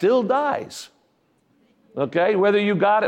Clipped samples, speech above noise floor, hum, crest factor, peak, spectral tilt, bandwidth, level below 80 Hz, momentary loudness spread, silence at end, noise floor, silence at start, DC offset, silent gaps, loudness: under 0.1%; 45 dB; none; 14 dB; -8 dBFS; -6 dB/octave; 13.5 kHz; -72 dBFS; 18 LU; 0 s; -64 dBFS; 0 s; under 0.1%; none; -20 LUFS